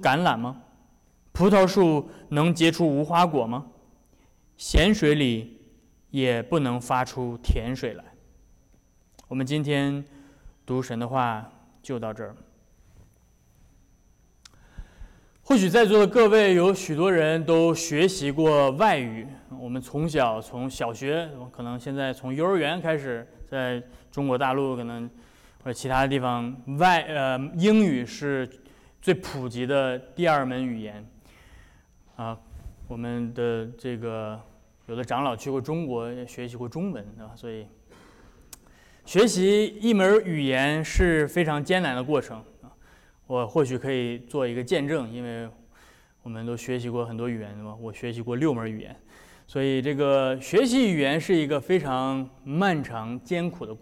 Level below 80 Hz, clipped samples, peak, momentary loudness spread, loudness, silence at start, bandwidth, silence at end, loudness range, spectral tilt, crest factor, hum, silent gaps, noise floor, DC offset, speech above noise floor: -42 dBFS; under 0.1%; -12 dBFS; 17 LU; -25 LUFS; 0 s; 16.5 kHz; 0.05 s; 11 LU; -5.5 dB/octave; 14 dB; none; none; -60 dBFS; under 0.1%; 36 dB